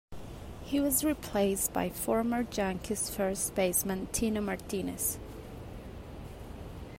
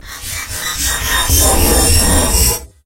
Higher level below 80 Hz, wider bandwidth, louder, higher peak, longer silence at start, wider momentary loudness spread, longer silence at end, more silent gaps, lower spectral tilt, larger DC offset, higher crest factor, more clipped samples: second, -50 dBFS vs -18 dBFS; about the same, 16 kHz vs 16.5 kHz; second, -31 LUFS vs -12 LUFS; second, -14 dBFS vs 0 dBFS; about the same, 0.1 s vs 0.05 s; first, 17 LU vs 11 LU; second, 0 s vs 0.2 s; neither; first, -4 dB/octave vs -2.5 dB/octave; neither; about the same, 18 dB vs 14 dB; neither